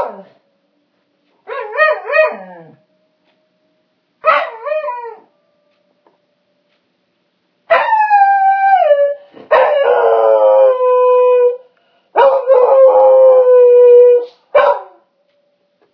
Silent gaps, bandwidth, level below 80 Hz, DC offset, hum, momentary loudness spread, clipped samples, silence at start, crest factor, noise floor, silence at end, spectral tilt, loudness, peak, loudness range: none; 5.4 kHz; -68 dBFS; under 0.1%; none; 14 LU; under 0.1%; 0 s; 12 dB; -63 dBFS; 1.1 s; -4.5 dB/octave; -10 LUFS; 0 dBFS; 12 LU